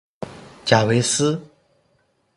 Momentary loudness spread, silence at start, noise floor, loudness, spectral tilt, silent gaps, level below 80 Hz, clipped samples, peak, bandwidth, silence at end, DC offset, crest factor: 19 LU; 0.2 s; -65 dBFS; -19 LUFS; -4 dB/octave; none; -56 dBFS; under 0.1%; 0 dBFS; 11.5 kHz; 0.9 s; under 0.1%; 22 dB